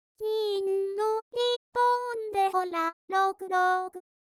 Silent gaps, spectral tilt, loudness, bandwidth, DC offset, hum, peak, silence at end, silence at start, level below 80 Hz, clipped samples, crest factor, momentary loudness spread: 1.22-1.31 s, 1.56-1.72 s, 2.93-3.08 s; -2 dB/octave; -28 LUFS; 16 kHz; under 0.1%; none; -16 dBFS; 0.3 s; 0.2 s; -74 dBFS; under 0.1%; 14 dB; 5 LU